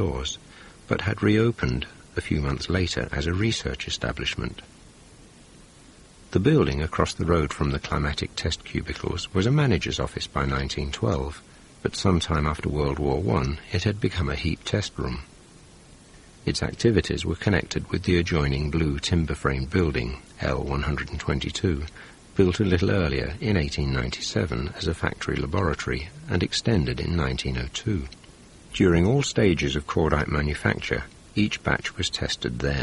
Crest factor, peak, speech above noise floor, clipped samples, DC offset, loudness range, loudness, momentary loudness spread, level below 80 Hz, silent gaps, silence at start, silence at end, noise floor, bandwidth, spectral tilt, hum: 22 dB; -4 dBFS; 25 dB; under 0.1%; under 0.1%; 4 LU; -25 LUFS; 9 LU; -36 dBFS; none; 0 s; 0 s; -50 dBFS; 11.5 kHz; -5.5 dB/octave; none